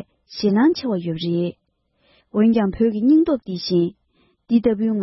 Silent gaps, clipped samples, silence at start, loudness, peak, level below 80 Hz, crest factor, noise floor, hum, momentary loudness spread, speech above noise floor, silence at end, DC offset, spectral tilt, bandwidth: none; under 0.1%; 0.3 s; -20 LUFS; -6 dBFS; -52 dBFS; 14 dB; -65 dBFS; none; 8 LU; 47 dB; 0 s; under 0.1%; -8 dB/octave; 6 kHz